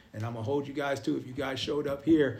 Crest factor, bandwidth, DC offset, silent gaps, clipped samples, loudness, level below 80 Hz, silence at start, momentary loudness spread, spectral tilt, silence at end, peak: 16 dB; 14.5 kHz; under 0.1%; none; under 0.1%; -31 LUFS; -62 dBFS; 0.15 s; 8 LU; -6 dB/octave; 0 s; -14 dBFS